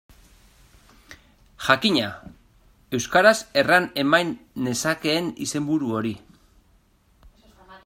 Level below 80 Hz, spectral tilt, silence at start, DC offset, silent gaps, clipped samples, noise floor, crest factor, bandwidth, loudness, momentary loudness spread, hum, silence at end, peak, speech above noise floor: -58 dBFS; -3.5 dB/octave; 1.1 s; under 0.1%; none; under 0.1%; -60 dBFS; 24 dB; 16 kHz; -22 LUFS; 13 LU; none; 0.1 s; -2 dBFS; 38 dB